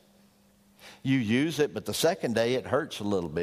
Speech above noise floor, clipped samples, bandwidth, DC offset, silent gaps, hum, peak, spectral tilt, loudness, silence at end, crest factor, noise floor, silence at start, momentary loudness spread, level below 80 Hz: 34 dB; under 0.1%; 15.5 kHz; under 0.1%; none; none; -10 dBFS; -5 dB/octave; -28 LUFS; 0 s; 18 dB; -62 dBFS; 0.85 s; 5 LU; -62 dBFS